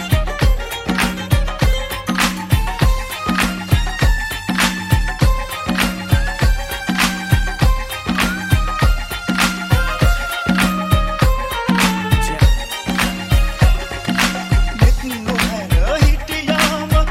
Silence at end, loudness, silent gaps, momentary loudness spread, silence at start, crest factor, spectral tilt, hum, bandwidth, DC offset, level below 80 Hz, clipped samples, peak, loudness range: 0 s; -17 LUFS; none; 5 LU; 0 s; 16 dB; -4.5 dB/octave; none; 16.5 kHz; under 0.1%; -20 dBFS; under 0.1%; 0 dBFS; 1 LU